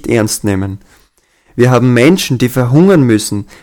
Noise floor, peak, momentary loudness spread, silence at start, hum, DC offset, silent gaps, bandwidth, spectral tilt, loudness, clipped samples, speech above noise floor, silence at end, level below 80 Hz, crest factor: -52 dBFS; 0 dBFS; 12 LU; 0.05 s; none; under 0.1%; none; 18.5 kHz; -6 dB/octave; -10 LUFS; 0.7%; 42 dB; 0.2 s; -42 dBFS; 10 dB